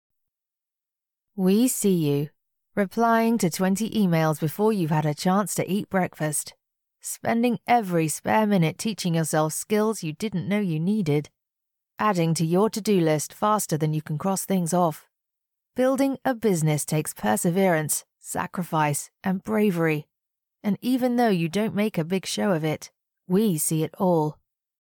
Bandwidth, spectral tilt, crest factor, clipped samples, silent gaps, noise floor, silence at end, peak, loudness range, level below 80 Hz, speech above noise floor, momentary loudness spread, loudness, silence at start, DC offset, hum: 19 kHz; -5.5 dB/octave; 14 dB; under 0.1%; none; -89 dBFS; 0.5 s; -12 dBFS; 2 LU; -66 dBFS; 65 dB; 8 LU; -24 LUFS; 1.35 s; under 0.1%; none